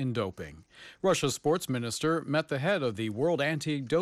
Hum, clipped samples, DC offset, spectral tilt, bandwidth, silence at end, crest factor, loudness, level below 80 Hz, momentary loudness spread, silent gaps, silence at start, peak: none; under 0.1%; under 0.1%; -5 dB/octave; 15 kHz; 0 s; 14 dB; -30 LUFS; -62 dBFS; 12 LU; none; 0 s; -16 dBFS